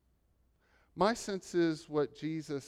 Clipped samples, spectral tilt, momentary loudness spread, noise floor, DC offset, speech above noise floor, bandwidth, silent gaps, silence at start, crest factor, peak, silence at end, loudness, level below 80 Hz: under 0.1%; -5.5 dB/octave; 7 LU; -72 dBFS; under 0.1%; 39 dB; 13 kHz; none; 0.95 s; 20 dB; -16 dBFS; 0 s; -34 LUFS; -66 dBFS